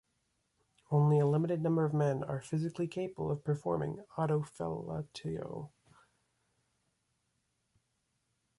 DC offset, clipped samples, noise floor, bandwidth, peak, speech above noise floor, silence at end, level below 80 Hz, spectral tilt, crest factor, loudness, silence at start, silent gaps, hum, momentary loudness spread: under 0.1%; under 0.1%; -80 dBFS; 11.5 kHz; -18 dBFS; 47 dB; 2.9 s; -66 dBFS; -8.5 dB/octave; 18 dB; -34 LUFS; 0.9 s; none; none; 12 LU